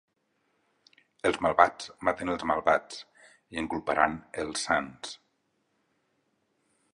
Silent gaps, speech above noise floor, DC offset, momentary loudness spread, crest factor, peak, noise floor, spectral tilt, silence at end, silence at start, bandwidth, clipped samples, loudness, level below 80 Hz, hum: none; 47 dB; under 0.1%; 18 LU; 28 dB; -4 dBFS; -75 dBFS; -3.5 dB/octave; 1.8 s; 1.25 s; 11.5 kHz; under 0.1%; -28 LUFS; -60 dBFS; none